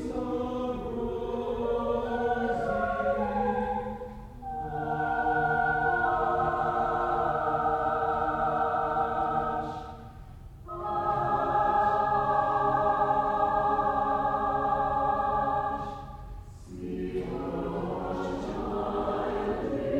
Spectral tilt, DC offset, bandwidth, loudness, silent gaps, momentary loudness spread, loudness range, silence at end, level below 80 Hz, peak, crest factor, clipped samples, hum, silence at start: -7.5 dB/octave; under 0.1%; 9.6 kHz; -29 LUFS; none; 13 LU; 6 LU; 0 s; -46 dBFS; -14 dBFS; 14 dB; under 0.1%; none; 0 s